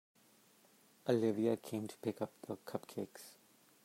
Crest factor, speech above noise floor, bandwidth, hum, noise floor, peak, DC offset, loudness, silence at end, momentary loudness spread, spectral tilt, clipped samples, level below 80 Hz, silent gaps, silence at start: 22 dB; 30 dB; 16 kHz; none; -68 dBFS; -20 dBFS; under 0.1%; -40 LUFS; 0.5 s; 14 LU; -6.5 dB/octave; under 0.1%; -86 dBFS; none; 1.05 s